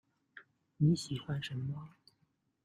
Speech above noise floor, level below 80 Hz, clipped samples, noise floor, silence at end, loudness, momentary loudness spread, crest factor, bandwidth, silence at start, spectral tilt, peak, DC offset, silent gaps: 43 dB; -68 dBFS; under 0.1%; -77 dBFS; 0.75 s; -36 LUFS; 26 LU; 20 dB; 11.5 kHz; 0.35 s; -6.5 dB/octave; -18 dBFS; under 0.1%; none